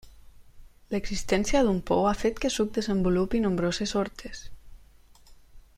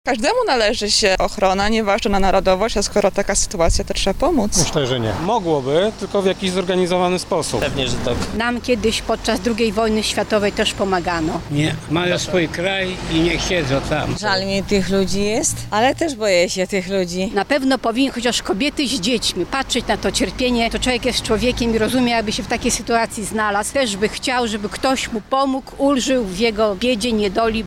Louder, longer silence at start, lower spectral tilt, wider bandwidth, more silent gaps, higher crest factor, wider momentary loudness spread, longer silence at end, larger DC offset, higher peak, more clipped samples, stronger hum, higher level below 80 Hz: second, -27 LUFS vs -18 LUFS; about the same, 0.05 s vs 0.05 s; about the same, -5 dB/octave vs -4 dB/octave; second, 15.5 kHz vs 17.5 kHz; neither; about the same, 18 dB vs 14 dB; first, 10 LU vs 4 LU; first, 0.15 s vs 0 s; neither; second, -10 dBFS vs -4 dBFS; neither; neither; second, -42 dBFS vs -34 dBFS